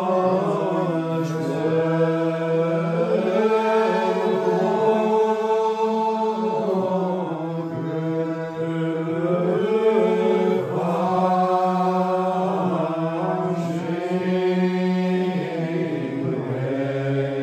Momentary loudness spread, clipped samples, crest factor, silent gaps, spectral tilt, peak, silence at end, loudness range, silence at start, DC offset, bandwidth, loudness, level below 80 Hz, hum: 6 LU; under 0.1%; 14 dB; none; -8 dB/octave; -6 dBFS; 0 s; 3 LU; 0 s; under 0.1%; 12.5 kHz; -22 LUFS; -70 dBFS; none